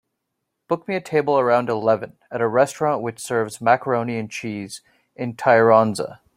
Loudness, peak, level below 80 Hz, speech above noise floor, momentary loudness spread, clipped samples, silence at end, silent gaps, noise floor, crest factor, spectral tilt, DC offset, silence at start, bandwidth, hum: -20 LUFS; -2 dBFS; -64 dBFS; 58 dB; 15 LU; under 0.1%; 0.2 s; none; -78 dBFS; 20 dB; -5.5 dB/octave; under 0.1%; 0.7 s; 16 kHz; none